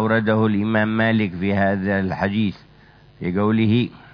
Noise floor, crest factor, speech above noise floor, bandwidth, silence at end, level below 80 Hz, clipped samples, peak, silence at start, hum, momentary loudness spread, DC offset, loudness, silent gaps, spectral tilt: -49 dBFS; 16 dB; 30 dB; 5.4 kHz; 0.15 s; -52 dBFS; under 0.1%; -4 dBFS; 0 s; none; 5 LU; under 0.1%; -20 LUFS; none; -9.5 dB/octave